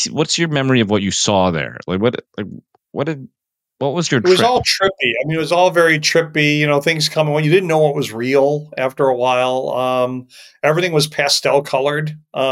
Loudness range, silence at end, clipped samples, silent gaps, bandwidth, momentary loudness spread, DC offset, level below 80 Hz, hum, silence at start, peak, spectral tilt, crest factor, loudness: 4 LU; 0 s; under 0.1%; none; 16.5 kHz; 10 LU; under 0.1%; -54 dBFS; none; 0 s; -2 dBFS; -4 dB/octave; 14 dB; -16 LUFS